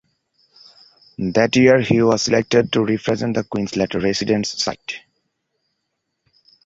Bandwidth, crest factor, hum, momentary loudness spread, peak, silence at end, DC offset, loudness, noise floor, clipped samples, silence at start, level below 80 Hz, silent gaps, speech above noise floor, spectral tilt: 8 kHz; 18 dB; none; 13 LU; -2 dBFS; 1.65 s; under 0.1%; -18 LUFS; -75 dBFS; under 0.1%; 1.2 s; -52 dBFS; none; 58 dB; -5 dB/octave